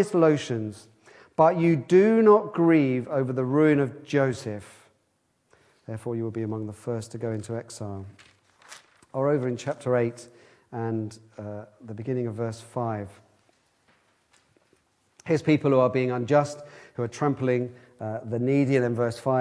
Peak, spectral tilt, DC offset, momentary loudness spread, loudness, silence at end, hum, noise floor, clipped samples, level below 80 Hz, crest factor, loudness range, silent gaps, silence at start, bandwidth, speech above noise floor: -6 dBFS; -7.5 dB/octave; under 0.1%; 18 LU; -25 LUFS; 0 s; none; -71 dBFS; under 0.1%; -68 dBFS; 20 dB; 13 LU; none; 0 s; 11 kHz; 47 dB